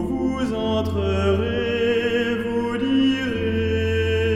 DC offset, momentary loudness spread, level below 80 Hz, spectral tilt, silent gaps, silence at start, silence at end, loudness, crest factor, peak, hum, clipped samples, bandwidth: under 0.1%; 4 LU; -38 dBFS; -7 dB/octave; none; 0 s; 0 s; -22 LUFS; 12 dB; -8 dBFS; none; under 0.1%; 11.5 kHz